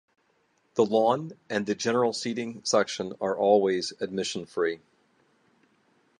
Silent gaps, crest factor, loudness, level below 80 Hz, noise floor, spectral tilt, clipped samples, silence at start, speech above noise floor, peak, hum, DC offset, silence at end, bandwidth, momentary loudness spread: none; 20 dB; -27 LUFS; -72 dBFS; -69 dBFS; -4 dB/octave; under 0.1%; 0.75 s; 43 dB; -8 dBFS; none; under 0.1%; 1.4 s; 11.5 kHz; 9 LU